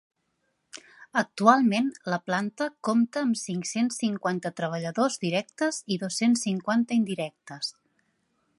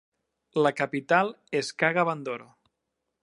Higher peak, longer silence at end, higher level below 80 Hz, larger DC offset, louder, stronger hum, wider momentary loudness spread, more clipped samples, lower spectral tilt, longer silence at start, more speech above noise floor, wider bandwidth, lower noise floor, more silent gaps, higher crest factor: first, -2 dBFS vs -6 dBFS; about the same, 0.9 s vs 0.8 s; about the same, -78 dBFS vs -80 dBFS; neither; about the same, -27 LUFS vs -26 LUFS; neither; about the same, 12 LU vs 10 LU; neither; about the same, -4.5 dB/octave vs -5 dB/octave; first, 0.75 s vs 0.55 s; second, 49 dB vs 56 dB; about the same, 11.5 kHz vs 11.5 kHz; second, -75 dBFS vs -82 dBFS; neither; about the same, 24 dB vs 22 dB